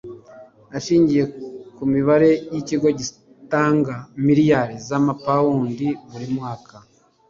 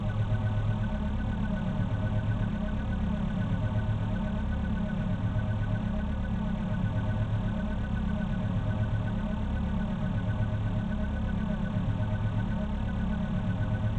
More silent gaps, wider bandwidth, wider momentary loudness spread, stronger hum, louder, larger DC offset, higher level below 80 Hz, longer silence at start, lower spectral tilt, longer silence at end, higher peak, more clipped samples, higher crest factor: neither; first, 7.6 kHz vs 6.4 kHz; first, 15 LU vs 2 LU; neither; first, -20 LUFS vs -31 LUFS; neither; second, -56 dBFS vs -36 dBFS; about the same, 0.05 s vs 0 s; second, -6.5 dB/octave vs -9 dB/octave; first, 0.5 s vs 0 s; first, -4 dBFS vs -18 dBFS; neither; about the same, 16 dB vs 12 dB